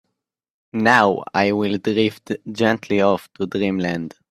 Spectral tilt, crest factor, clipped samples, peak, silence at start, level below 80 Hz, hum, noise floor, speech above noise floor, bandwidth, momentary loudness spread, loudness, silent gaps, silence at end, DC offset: -6 dB/octave; 20 dB; under 0.1%; 0 dBFS; 0.75 s; -60 dBFS; none; -80 dBFS; 60 dB; 14 kHz; 12 LU; -20 LUFS; none; 0.2 s; under 0.1%